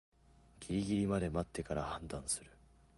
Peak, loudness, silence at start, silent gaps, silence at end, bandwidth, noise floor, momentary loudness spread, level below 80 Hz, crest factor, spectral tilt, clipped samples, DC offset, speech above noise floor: -22 dBFS; -38 LUFS; 0.55 s; none; 0.5 s; 11.5 kHz; -63 dBFS; 8 LU; -54 dBFS; 16 dB; -5 dB/octave; under 0.1%; under 0.1%; 25 dB